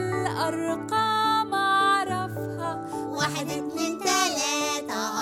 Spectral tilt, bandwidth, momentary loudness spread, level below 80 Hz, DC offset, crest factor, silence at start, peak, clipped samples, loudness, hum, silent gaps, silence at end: -3 dB/octave; 17 kHz; 9 LU; -64 dBFS; under 0.1%; 18 dB; 0 s; -8 dBFS; under 0.1%; -25 LUFS; none; none; 0 s